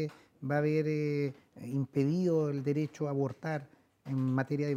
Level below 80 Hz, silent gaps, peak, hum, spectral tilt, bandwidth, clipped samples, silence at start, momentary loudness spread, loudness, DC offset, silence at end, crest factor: -74 dBFS; none; -16 dBFS; none; -8.5 dB/octave; 9.8 kHz; under 0.1%; 0 s; 10 LU; -33 LUFS; under 0.1%; 0 s; 16 dB